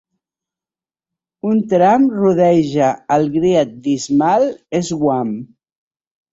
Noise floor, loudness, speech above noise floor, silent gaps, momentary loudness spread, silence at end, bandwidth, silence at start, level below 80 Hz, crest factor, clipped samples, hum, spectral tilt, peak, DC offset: under -90 dBFS; -15 LUFS; over 75 dB; none; 8 LU; 0.85 s; 8 kHz; 1.45 s; -56 dBFS; 14 dB; under 0.1%; none; -6.5 dB/octave; -2 dBFS; under 0.1%